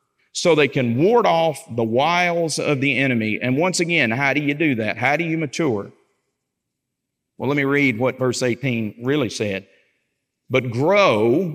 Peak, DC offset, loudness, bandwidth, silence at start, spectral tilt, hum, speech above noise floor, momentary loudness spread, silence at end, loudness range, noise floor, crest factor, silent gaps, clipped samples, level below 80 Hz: -2 dBFS; under 0.1%; -19 LUFS; 16 kHz; 0.35 s; -5 dB/octave; none; 60 dB; 8 LU; 0 s; 5 LU; -79 dBFS; 18 dB; none; under 0.1%; -70 dBFS